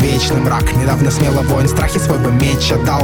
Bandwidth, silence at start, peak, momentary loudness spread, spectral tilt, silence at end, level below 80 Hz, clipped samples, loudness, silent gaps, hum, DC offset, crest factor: 19 kHz; 0 s; 0 dBFS; 1 LU; -5.5 dB/octave; 0 s; -24 dBFS; under 0.1%; -14 LUFS; none; none; under 0.1%; 12 dB